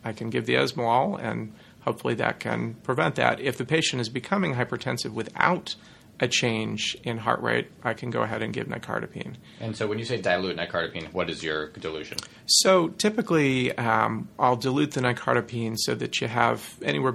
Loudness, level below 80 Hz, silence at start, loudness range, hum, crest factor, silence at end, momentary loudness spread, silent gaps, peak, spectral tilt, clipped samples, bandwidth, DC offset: -26 LUFS; -60 dBFS; 0.05 s; 6 LU; none; 24 dB; 0 s; 9 LU; none; -2 dBFS; -4 dB/octave; under 0.1%; 15.5 kHz; under 0.1%